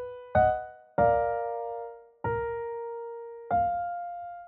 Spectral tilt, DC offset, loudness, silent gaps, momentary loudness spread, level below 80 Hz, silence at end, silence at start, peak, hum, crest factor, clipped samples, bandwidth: -6.5 dB/octave; under 0.1%; -30 LUFS; none; 14 LU; -52 dBFS; 0 s; 0 s; -12 dBFS; none; 18 dB; under 0.1%; 4 kHz